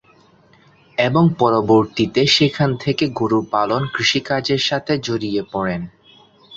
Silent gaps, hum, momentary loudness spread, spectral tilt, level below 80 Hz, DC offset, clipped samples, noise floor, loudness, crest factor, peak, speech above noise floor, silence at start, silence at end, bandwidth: none; none; 9 LU; -5.5 dB/octave; -52 dBFS; under 0.1%; under 0.1%; -52 dBFS; -18 LUFS; 16 dB; -2 dBFS; 35 dB; 1 s; 0 s; 7.8 kHz